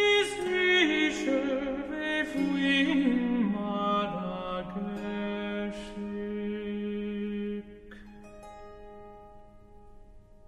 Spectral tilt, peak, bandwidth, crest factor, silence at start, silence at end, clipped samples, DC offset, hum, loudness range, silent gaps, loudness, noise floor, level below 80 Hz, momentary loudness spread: -5 dB/octave; -12 dBFS; 12.5 kHz; 18 dB; 0 s; 0.25 s; under 0.1%; under 0.1%; none; 12 LU; none; -29 LUFS; -51 dBFS; -54 dBFS; 24 LU